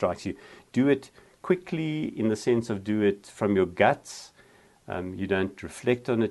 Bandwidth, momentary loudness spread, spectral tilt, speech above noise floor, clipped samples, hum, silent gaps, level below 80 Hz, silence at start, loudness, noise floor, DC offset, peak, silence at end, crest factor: 12 kHz; 13 LU; -6.5 dB/octave; 31 dB; under 0.1%; none; none; -62 dBFS; 0 s; -27 LUFS; -57 dBFS; under 0.1%; -6 dBFS; 0 s; 22 dB